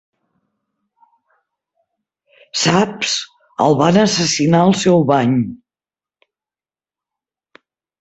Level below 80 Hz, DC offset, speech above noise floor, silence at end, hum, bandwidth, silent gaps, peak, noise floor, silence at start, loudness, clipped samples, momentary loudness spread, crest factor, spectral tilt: -56 dBFS; under 0.1%; over 76 dB; 2.45 s; none; 8.2 kHz; none; 0 dBFS; under -90 dBFS; 2.55 s; -15 LUFS; under 0.1%; 9 LU; 18 dB; -4.5 dB/octave